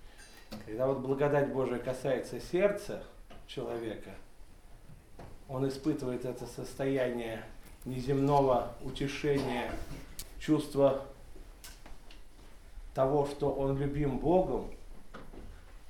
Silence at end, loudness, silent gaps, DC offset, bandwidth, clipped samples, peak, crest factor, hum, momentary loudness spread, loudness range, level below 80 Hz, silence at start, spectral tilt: 0 s; -33 LUFS; none; under 0.1%; 18 kHz; under 0.1%; -14 dBFS; 20 dB; none; 23 LU; 6 LU; -50 dBFS; 0 s; -6.5 dB/octave